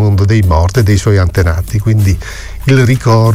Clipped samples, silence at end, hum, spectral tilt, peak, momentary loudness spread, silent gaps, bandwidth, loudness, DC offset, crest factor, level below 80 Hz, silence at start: under 0.1%; 0 s; none; -7 dB/octave; 0 dBFS; 6 LU; none; 15.5 kHz; -11 LUFS; under 0.1%; 10 dB; -22 dBFS; 0 s